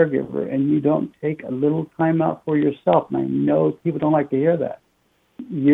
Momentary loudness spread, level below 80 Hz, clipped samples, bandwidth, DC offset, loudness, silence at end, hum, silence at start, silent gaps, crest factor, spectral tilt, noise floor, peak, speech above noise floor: 8 LU; -62 dBFS; under 0.1%; 3.9 kHz; under 0.1%; -21 LUFS; 0 s; none; 0 s; none; 16 dB; -10.5 dB/octave; -64 dBFS; -4 dBFS; 44 dB